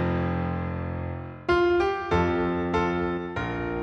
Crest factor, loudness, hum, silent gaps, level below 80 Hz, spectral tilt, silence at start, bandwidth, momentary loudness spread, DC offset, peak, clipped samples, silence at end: 14 dB; -26 LUFS; none; none; -42 dBFS; -8 dB/octave; 0 s; 7 kHz; 9 LU; under 0.1%; -12 dBFS; under 0.1%; 0 s